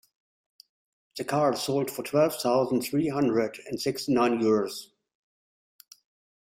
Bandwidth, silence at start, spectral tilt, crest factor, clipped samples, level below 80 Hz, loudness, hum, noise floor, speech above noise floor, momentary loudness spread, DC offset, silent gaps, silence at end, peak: 16 kHz; 1.15 s; -5.5 dB/octave; 18 dB; under 0.1%; -68 dBFS; -26 LUFS; none; under -90 dBFS; over 64 dB; 9 LU; under 0.1%; none; 1.6 s; -10 dBFS